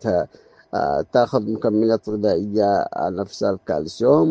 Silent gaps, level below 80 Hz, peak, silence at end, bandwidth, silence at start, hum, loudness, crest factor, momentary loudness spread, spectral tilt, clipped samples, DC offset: none; -56 dBFS; -2 dBFS; 0 s; 8.4 kHz; 0 s; none; -21 LUFS; 18 dB; 6 LU; -7 dB/octave; under 0.1%; under 0.1%